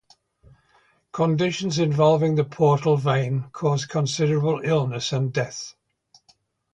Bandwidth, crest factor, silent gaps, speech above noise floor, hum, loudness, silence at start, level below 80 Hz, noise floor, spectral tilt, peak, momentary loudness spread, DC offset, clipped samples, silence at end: 9.2 kHz; 18 dB; none; 41 dB; none; -22 LUFS; 1.15 s; -58 dBFS; -62 dBFS; -6 dB/octave; -6 dBFS; 9 LU; under 0.1%; under 0.1%; 1 s